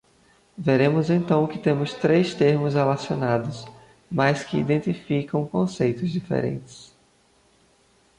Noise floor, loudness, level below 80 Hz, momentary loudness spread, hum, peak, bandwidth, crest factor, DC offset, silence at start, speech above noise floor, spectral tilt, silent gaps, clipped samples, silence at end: -61 dBFS; -23 LUFS; -58 dBFS; 9 LU; none; -6 dBFS; 11 kHz; 16 dB; under 0.1%; 0.6 s; 38 dB; -7.5 dB/octave; none; under 0.1%; 1.35 s